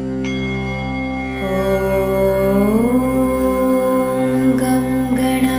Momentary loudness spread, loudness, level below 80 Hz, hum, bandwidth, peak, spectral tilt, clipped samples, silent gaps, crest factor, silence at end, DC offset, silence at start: 7 LU; -17 LUFS; -34 dBFS; none; 16 kHz; -4 dBFS; -6.5 dB/octave; under 0.1%; none; 14 dB; 0 s; under 0.1%; 0 s